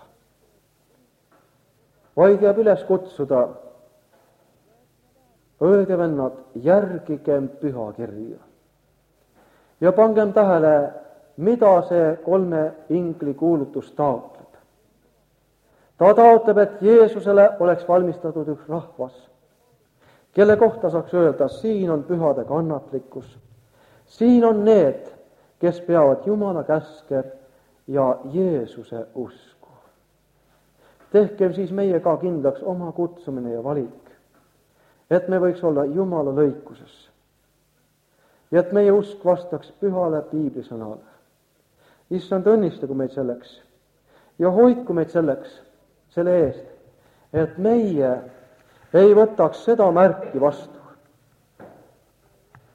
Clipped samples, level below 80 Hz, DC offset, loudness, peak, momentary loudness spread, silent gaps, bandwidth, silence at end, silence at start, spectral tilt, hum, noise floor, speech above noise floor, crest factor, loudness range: under 0.1%; -62 dBFS; under 0.1%; -19 LUFS; -2 dBFS; 15 LU; none; 7.4 kHz; 1.1 s; 2.15 s; -9 dB/octave; none; -64 dBFS; 45 dB; 20 dB; 7 LU